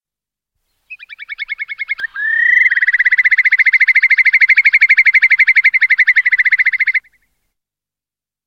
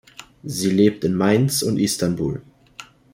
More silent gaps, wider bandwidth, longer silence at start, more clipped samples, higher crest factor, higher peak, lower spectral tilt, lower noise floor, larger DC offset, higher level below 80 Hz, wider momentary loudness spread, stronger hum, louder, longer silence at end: neither; second, 7.2 kHz vs 16.5 kHz; first, 0.9 s vs 0.2 s; neither; about the same, 14 dB vs 18 dB; first, 0 dBFS vs -4 dBFS; second, 3 dB/octave vs -5.5 dB/octave; first, -89 dBFS vs -44 dBFS; neither; second, -64 dBFS vs -52 dBFS; second, 13 LU vs 22 LU; neither; first, -9 LUFS vs -20 LUFS; first, 1.45 s vs 0.3 s